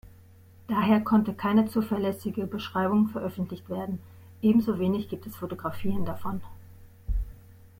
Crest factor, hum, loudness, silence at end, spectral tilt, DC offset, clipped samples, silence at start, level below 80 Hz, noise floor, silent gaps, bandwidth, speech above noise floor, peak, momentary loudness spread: 18 dB; none; -28 LUFS; 0.3 s; -8 dB/octave; under 0.1%; under 0.1%; 0.7 s; -42 dBFS; -53 dBFS; none; 16.5 kHz; 26 dB; -10 dBFS; 13 LU